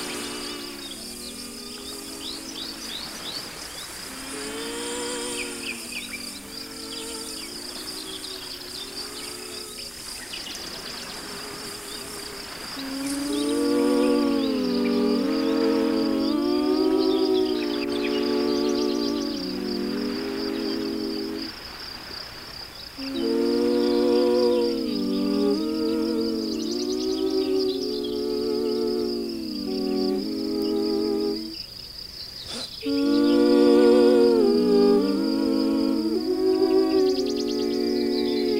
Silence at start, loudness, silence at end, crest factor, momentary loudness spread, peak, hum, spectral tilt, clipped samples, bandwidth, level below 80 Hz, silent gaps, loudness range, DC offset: 0 s; -25 LUFS; 0 s; 18 dB; 14 LU; -6 dBFS; none; -4 dB/octave; under 0.1%; 16 kHz; -54 dBFS; none; 13 LU; under 0.1%